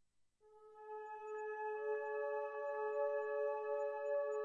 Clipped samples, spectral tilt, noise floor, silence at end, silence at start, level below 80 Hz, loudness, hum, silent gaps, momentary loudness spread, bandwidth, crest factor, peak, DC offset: under 0.1%; -3.5 dB/octave; -72 dBFS; 0 s; 0.45 s; under -90 dBFS; -42 LUFS; 50 Hz at -95 dBFS; none; 10 LU; 7.4 kHz; 14 dB; -28 dBFS; under 0.1%